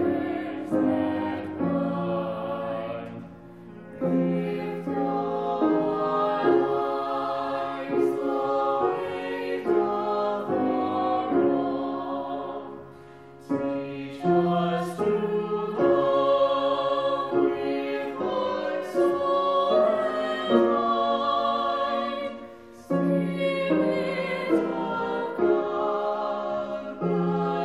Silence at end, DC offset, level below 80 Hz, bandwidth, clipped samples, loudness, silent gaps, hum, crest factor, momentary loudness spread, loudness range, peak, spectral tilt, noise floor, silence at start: 0 s; 0.1%; -66 dBFS; 12 kHz; under 0.1%; -26 LUFS; none; none; 18 dB; 9 LU; 5 LU; -6 dBFS; -7.5 dB/octave; -46 dBFS; 0 s